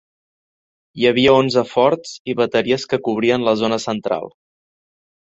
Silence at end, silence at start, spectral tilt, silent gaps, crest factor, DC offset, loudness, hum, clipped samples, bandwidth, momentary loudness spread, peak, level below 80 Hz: 0.95 s; 0.95 s; -5 dB/octave; 2.19-2.25 s; 18 dB; under 0.1%; -17 LUFS; none; under 0.1%; 8 kHz; 11 LU; -2 dBFS; -56 dBFS